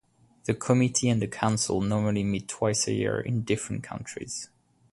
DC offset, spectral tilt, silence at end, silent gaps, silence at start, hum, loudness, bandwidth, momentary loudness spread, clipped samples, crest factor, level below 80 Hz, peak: under 0.1%; -5 dB/octave; 0.5 s; none; 0.45 s; none; -27 LUFS; 11.5 kHz; 13 LU; under 0.1%; 20 dB; -54 dBFS; -8 dBFS